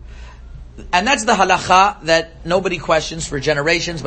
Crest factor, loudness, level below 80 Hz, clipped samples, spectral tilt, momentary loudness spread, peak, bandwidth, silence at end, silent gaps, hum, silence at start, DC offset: 18 dB; -16 LUFS; -36 dBFS; under 0.1%; -3.5 dB/octave; 7 LU; 0 dBFS; 8.8 kHz; 0 s; none; none; 0 s; under 0.1%